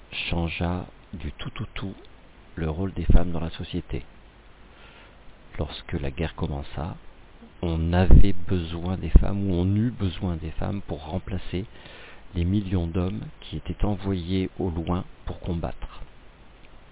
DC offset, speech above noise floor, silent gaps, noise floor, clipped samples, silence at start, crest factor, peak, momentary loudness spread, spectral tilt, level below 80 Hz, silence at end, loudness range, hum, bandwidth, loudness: under 0.1%; 27 dB; none; -49 dBFS; under 0.1%; 0.1 s; 20 dB; -4 dBFS; 15 LU; -11 dB/octave; -30 dBFS; 0.25 s; 10 LU; none; 4 kHz; -28 LUFS